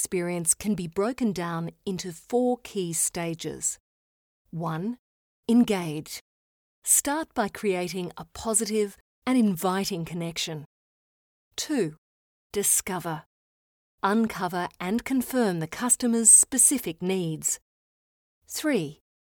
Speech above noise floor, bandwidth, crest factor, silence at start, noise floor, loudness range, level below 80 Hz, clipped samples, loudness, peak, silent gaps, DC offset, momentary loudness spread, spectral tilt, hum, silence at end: over 64 dB; over 20 kHz; 22 dB; 0 s; under -90 dBFS; 9 LU; -60 dBFS; under 0.1%; -25 LUFS; -4 dBFS; 3.80-4.45 s, 4.99-5.43 s, 6.21-6.82 s, 9.01-9.22 s, 10.66-11.51 s, 11.98-12.50 s, 13.26-13.98 s, 17.61-18.41 s; under 0.1%; 14 LU; -3.5 dB/octave; none; 0.3 s